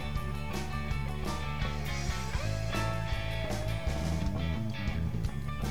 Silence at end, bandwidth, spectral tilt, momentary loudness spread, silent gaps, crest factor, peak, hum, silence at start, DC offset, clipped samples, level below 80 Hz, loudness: 0 s; 19 kHz; -5.5 dB/octave; 3 LU; none; 14 dB; -20 dBFS; none; 0 s; 1%; under 0.1%; -38 dBFS; -35 LUFS